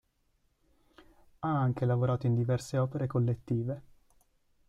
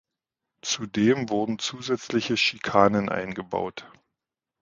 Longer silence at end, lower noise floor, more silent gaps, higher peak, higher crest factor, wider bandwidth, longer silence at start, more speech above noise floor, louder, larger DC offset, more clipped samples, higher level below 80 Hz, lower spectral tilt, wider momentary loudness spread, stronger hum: first, 0.9 s vs 0.75 s; second, -73 dBFS vs -86 dBFS; neither; second, -18 dBFS vs -2 dBFS; second, 14 dB vs 24 dB; first, 11 kHz vs 9.2 kHz; first, 1.4 s vs 0.65 s; second, 43 dB vs 61 dB; second, -31 LUFS vs -25 LUFS; neither; neither; about the same, -62 dBFS vs -60 dBFS; first, -8.5 dB/octave vs -4 dB/octave; second, 7 LU vs 10 LU; neither